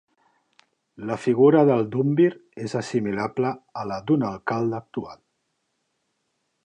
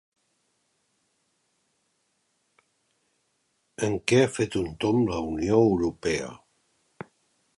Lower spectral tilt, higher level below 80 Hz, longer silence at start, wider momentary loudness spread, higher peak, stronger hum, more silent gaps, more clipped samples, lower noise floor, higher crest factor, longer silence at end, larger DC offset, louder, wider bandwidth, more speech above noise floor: first, -8 dB/octave vs -6 dB/octave; second, -64 dBFS vs -52 dBFS; second, 1 s vs 3.8 s; second, 17 LU vs 24 LU; about the same, -6 dBFS vs -8 dBFS; neither; neither; neither; about the same, -75 dBFS vs -73 dBFS; about the same, 18 dB vs 20 dB; first, 1.5 s vs 1.2 s; neither; about the same, -23 LUFS vs -25 LUFS; second, 10 kHz vs 11.5 kHz; about the same, 52 dB vs 49 dB